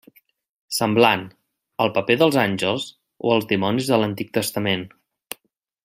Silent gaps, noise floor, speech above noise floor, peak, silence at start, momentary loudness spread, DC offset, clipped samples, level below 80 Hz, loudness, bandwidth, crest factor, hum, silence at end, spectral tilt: none; -67 dBFS; 47 dB; -2 dBFS; 0.7 s; 20 LU; under 0.1%; under 0.1%; -64 dBFS; -21 LUFS; 16 kHz; 20 dB; none; 0.95 s; -4.5 dB/octave